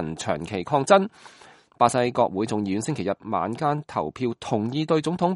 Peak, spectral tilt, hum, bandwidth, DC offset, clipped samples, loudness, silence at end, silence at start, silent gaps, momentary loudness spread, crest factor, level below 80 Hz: -2 dBFS; -5.5 dB/octave; none; 11.5 kHz; under 0.1%; under 0.1%; -24 LUFS; 0 s; 0 s; none; 9 LU; 22 dB; -60 dBFS